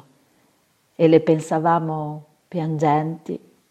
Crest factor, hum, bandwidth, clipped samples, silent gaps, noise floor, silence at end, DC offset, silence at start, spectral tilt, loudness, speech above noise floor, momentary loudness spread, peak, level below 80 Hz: 20 dB; none; 10 kHz; under 0.1%; none; -63 dBFS; 0.35 s; under 0.1%; 1 s; -7.5 dB/octave; -20 LUFS; 43 dB; 16 LU; 0 dBFS; -66 dBFS